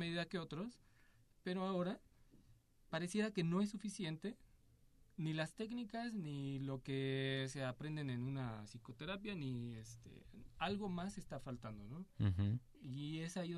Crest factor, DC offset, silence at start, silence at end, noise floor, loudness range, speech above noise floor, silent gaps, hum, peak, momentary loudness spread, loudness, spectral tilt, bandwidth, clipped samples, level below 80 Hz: 18 dB; under 0.1%; 0 s; 0 s; -70 dBFS; 4 LU; 26 dB; none; none; -26 dBFS; 13 LU; -44 LUFS; -6 dB/octave; 13 kHz; under 0.1%; -66 dBFS